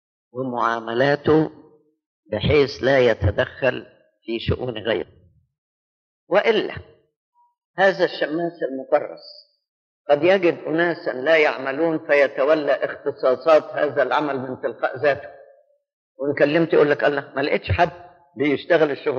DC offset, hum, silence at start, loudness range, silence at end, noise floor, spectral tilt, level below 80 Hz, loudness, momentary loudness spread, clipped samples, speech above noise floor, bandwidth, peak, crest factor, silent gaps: under 0.1%; none; 0.35 s; 6 LU; 0 s; -55 dBFS; -4 dB/octave; -48 dBFS; -20 LUFS; 11 LU; under 0.1%; 35 dB; 7 kHz; -4 dBFS; 16 dB; 2.06-2.23 s, 5.58-6.27 s, 7.16-7.32 s, 7.65-7.74 s, 9.69-10.05 s, 15.93-16.15 s